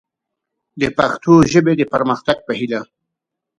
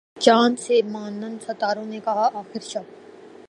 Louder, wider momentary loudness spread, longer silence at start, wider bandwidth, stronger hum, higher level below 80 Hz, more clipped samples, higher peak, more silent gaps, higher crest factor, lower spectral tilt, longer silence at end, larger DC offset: first, -16 LUFS vs -22 LUFS; second, 11 LU vs 15 LU; first, 0.75 s vs 0.15 s; about the same, 10 kHz vs 11 kHz; neither; first, -48 dBFS vs -76 dBFS; neither; about the same, 0 dBFS vs -2 dBFS; neither; about the same, 18 dB vs 22 dB; first, -6 dB/octave vs -4 dB/octave; first, 0.75 s vs 0.2 s; neither